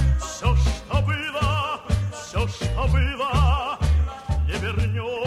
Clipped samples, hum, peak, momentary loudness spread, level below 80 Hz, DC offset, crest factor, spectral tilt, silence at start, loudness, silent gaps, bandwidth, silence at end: under 0.1%; none; -8 dBFS; 5 LU; -24 dBFS; under 0.1%; 14 dB; -5.5 dB/octave; 0 s; -24 LUFS; none; 12 kHz; 0 s